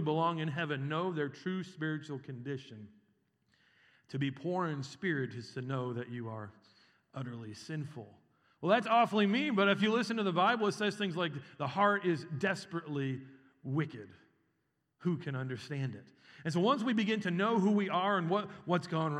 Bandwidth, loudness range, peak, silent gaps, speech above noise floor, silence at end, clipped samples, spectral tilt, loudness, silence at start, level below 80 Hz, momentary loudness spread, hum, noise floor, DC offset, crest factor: 11 kHz; 10 LU; -14 dBFS; none; 47 dB; 0 s; under 0.1%; -6.5 dB/octave; -34 LUFS; 0 s; -86 dBFS; 15 LU; none; -80 dBFS; under 0.1%; 20 dB